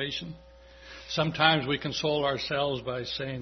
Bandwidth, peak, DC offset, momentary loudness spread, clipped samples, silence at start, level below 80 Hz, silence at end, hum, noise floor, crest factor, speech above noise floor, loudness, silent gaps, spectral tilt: 6.4 kHz; -6 dBFS; under 0.1%; 21 LU; under 0.1%; 0 s; -56 dBFS; 0 s; none; -49 dBFS; 24 dB; 20 dB; -28 LUFS; none; -4.5 dB/octave